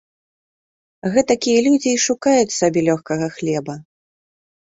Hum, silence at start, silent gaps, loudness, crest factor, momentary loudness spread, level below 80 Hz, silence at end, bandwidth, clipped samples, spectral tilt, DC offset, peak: none; 1.05 s; none; -18 LUFS; 18 dB; 10 LU; -58 dBFS; 0.95 s; 8 kHz; under 0.1%; -4 dB/octave; under 0.1%; -2 dBFS